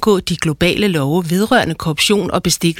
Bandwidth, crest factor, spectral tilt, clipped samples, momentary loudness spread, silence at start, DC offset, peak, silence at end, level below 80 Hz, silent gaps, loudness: 17.5 kHz; 14 dB; -4.5 dB/octave; under 0.1%; 3 LU; 0 s; under 0.1%; -2 dBFS; 0 s; -40 dBFS; none; -15 LUFS